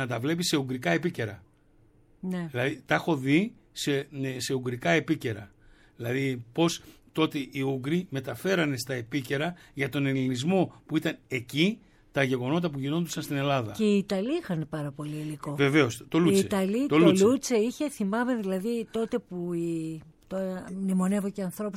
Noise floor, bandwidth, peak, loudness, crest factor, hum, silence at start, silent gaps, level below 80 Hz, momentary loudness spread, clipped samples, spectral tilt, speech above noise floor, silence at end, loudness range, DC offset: -61 dBFS; 16.5 kHz; -8 dBFS; -28 LUFS; 20 dB; none; 0 s; none; -62 dBFS; 11 LU; under 0.1%; -5.5 dB/octave; 33 dB; 0 s; 6 LU; under 0.1%